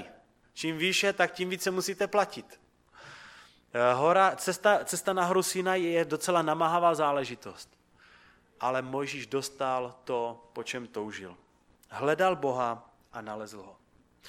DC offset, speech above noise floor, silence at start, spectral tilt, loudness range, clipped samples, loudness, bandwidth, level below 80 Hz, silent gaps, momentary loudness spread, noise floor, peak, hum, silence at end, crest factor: under 0.1%; 31 dB; 0 s; -3.5 dB/octave; 8 LU; under 0.1%; -29 LUFS; 17 kHz; -72 dBFS; none; 20 LU; -60 dBFS; -8 dBFS; none; 0 s; 22 dB